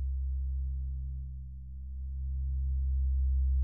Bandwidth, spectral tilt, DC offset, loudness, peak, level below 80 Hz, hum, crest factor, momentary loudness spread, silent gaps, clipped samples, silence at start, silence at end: 0.2 kHz; -32 dB/octave; 0.2%; -35 LUFS; -24 dBFS; -32 dBFS; none; 8 dB; 13 LU; none; under 0.1%; 0 s; 0 s